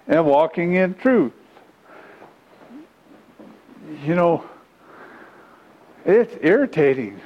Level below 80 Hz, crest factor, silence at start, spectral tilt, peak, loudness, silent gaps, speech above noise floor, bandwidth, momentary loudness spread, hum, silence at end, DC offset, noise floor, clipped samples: -64 dBFS; 18 dB; 0.05 s; -8.5 dB/octave; -2 dBFS; -19 LUFS; none; 33 dB; 8.4 kHz; 9 LU; none; 0.05 s; under 0.1%; -50 dBFS; under 0.1%